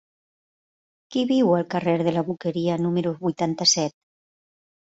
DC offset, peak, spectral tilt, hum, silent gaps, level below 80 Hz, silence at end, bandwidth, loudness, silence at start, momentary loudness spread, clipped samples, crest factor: under 0.1%; -6 dBFS; -4.5 dB/octave; none; none; -64 dBFS; 1.05 s; 8 kHz; -23 LUFS; 1.1 s; 8 LU; under 0.1%; 20 dB